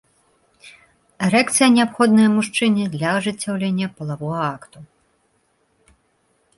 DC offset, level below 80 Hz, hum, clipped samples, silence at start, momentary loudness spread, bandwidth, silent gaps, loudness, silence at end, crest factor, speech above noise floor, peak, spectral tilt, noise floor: under 0.1%; -62 dBFS; none; under 0.1%; 0.65 s; 12 LU; 11.5 kHz; none; -18 LUFS; 1.75 s; 18 dB; 46 dB; -4 dBFS; -4.5 dB/octave; -65 dBFS